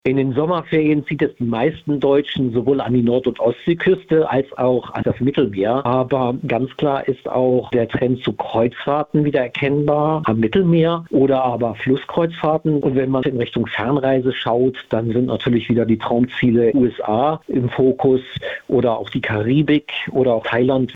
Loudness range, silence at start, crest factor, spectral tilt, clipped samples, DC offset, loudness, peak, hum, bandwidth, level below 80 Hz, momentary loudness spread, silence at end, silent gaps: 2 LU; 0.05 s; 12 dB; -9 dB/octave; under 0.1%; under 0.1%; -18 LUFS; -6 dBFS; none; 4.9 kHz; -50 dBFS; 5 LU; 0 s; none